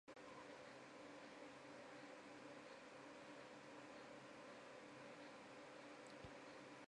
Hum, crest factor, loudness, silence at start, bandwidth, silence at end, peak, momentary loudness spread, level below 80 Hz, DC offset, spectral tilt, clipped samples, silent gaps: none; 16 dB; -59 LUFS; 0.05 s; 11 kHz; 0 s; -44 dBFS; 1 LU; -86 dBFS; under 0.1%; -4 dB/octave; under 0.1%; none